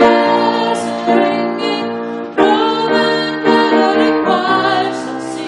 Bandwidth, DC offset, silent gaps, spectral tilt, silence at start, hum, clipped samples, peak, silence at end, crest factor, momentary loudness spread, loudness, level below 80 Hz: 11.5 kHz; under 0.1%; none; -4.5 dB/octave; 0 s; none; under 0.1%; 0 dBFS; 0 s; 14 dB; 8 LU; -14 LUFS; -54 dBFS